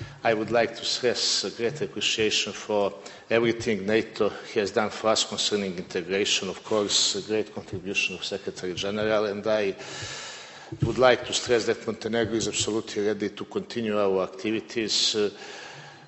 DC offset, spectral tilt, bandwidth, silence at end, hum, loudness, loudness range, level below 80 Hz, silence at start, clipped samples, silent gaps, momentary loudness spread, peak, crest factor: under 0.1%; -3 dB/octave; 8.4 kHz; 0 s; none; -26 LUFS; 2 LU; -58 dBFS; 0 s; under 0.1%; none; 11 LU; -6 dBFS; 22 dB